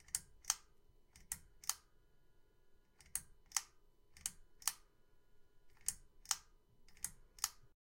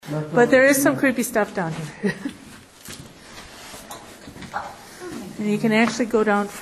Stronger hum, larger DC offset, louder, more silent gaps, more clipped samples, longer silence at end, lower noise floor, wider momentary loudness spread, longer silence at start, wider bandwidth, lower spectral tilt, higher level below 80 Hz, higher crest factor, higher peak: neither; neither; second, -44 LUFS vs -20 LUFS; neither; neither; first, 0.3 s vs 0 s; first, -68 dBFS vs -44 dBFS; second, 8 LU vs 23 LU; about the same, 0 s vs 0.05 s; first, 16.5 kHz vs 13.5 kHz; second, 2 dB/octave vs -4.5 dB/octave; second, -68 dBFS vs -56 dBFS; first, 36 dB vs 18 dB; second, -14 dBFS vs -4 dBFS